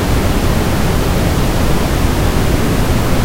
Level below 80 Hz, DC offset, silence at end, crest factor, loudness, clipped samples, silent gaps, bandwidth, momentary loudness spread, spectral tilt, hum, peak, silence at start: -18 dBFS; under 0.1%; 0 s; 12 dB; -15 LUFS; under 0.1%; none; 16 kHz; 0 LU; -5.5 dB/octave; none; 0 dBFS; 0 s